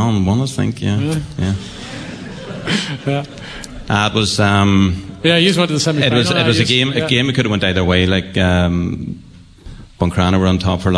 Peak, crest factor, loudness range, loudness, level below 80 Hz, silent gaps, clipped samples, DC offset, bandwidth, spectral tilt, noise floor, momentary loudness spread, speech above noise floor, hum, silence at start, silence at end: 0 dBFS; 14 dB; 7 LU; -15 LUFS; -38 dBFS; none; under 0.1%; under 0.1%; 11 kHz; -5.5 dB/octave; -36 dBFS; 16 LU; 21 dB; none; 0 s; 0 s